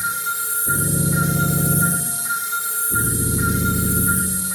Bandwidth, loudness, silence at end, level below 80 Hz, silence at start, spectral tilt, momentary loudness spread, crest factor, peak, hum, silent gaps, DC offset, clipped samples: 19.5 kHz; -18 LUFS; 0 s; -36 dBFS; 0 s; -4 dB/octave; 4 LU; 14 dB; -6 dBFS; none; none; under 0.1%; under 0.1%